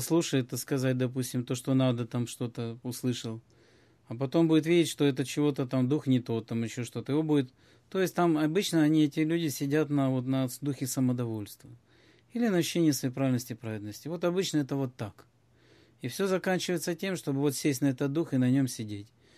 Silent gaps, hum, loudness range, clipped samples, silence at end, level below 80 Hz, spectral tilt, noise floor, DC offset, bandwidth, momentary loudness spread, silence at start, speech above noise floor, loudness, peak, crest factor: none; none; 4 LU; under 0.1%; 0.3 s; -70 dBFS; -6 dB/octave; -62 dBFS; under 0.1%; 15 kHz; 12 LU; 0 s; 33 dB; -29 LUFS; -14 dBFS; 16 dB